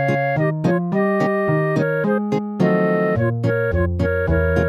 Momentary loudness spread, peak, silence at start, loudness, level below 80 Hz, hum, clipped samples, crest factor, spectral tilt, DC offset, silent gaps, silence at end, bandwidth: 2 LU; -4 dBFS; 0 s; -19 LUFS; -34 dBFS; none; under 0.1%; 14 dB; -9 dB/octave; under 0.1%; none; 0 s; 14 kHz